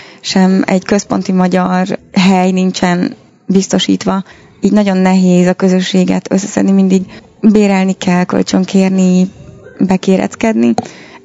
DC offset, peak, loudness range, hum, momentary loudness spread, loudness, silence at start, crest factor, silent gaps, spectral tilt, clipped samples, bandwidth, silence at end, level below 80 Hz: under 0.1%; 0 dBFS; 2 LU; none; 6 LU; -11 LUFS; 0 s; 12 dB; none; -6 dB/octave; 0.5%; 8 kHz; 0.05 s; -48 dBFS